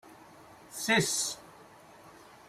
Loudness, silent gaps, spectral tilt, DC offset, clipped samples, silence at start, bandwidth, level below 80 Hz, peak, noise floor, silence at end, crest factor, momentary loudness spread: -29 LUFS; none; -2.5 dB/octave; under 0.1%; under 0.1%; 0.05 s; 16 kHz; -70 dBFS; -14 dBFS; -54 dBFS; 0.2 s; 22 dB; 19 LU